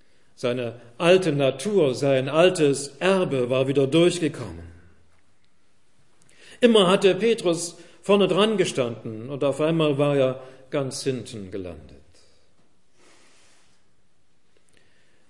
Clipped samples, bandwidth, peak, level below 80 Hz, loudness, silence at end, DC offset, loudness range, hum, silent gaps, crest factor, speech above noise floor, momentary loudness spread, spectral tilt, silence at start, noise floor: under 0.1%; 11.5 kHz; -4 dBFS; -64 dBFS; -22 LUFS; 3.5 s; 0.3%; 11 LU; none; none; 20 dB; 47 dB; 16 LU; -5 dB/octave; 0.4 s; -69 dBFS